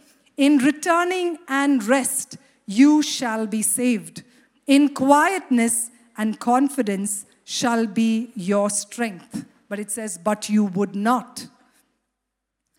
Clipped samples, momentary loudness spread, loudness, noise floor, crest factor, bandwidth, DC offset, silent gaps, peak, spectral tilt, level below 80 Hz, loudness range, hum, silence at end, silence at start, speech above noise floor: under 0.1%; 15 LU; -21 LUFS; -80 dBFS; 18 dB; 17 kHz; under 0.1%; none; -2 dBFS; -3.5 dB/octave; -72 dBFS; 5 LU; none; 1.3 s; 0.4 s; 60 dB